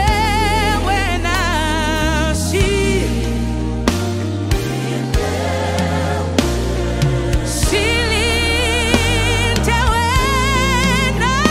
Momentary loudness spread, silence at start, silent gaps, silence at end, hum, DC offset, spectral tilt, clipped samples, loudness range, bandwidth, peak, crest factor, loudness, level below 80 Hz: 5 LU; 0 s; none; 0 s; none; under 0.1%; -4.5 dB/octave; under 0.1%; 4 LU; 16 kHz; 0 dBFS; 16 dB; -16 LUFS; -22 dBFS